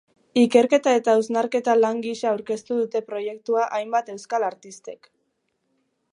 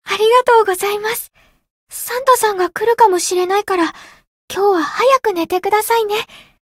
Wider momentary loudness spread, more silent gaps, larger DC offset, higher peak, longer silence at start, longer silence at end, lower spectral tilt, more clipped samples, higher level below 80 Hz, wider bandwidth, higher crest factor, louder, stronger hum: about the same, 12 LU vs 11 LU; second, none vs 1.71-1.87 s, 4.27-4.48 s; neither; about the same, -2 dBFS vs 0 dBFS; first, 0.35 s vs 0.05 s; first, 1.15 s vs 0.3 s; first, -4.5 dB/octave vs -1.5 dB/octave; neither; second, -76 dBFS vs -58 dBFS; second, 10.5 kHz vs 16.5 kHz; about the same, 20 dB vs 16 dB; second, -22 LUFS vs -15 LUFS; neither